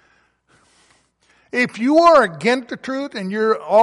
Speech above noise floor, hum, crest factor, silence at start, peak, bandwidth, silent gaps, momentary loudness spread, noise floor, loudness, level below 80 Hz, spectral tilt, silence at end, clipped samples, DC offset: 43 dB; none; 16 dB; 1.55 s; -2 dBFS; 11.5 kHz; none; 14 LU; -59 dBFS; -17 LUFS; -60 dBFS; -5 dB/octave; 0 s; under 0.1%; under 0.1%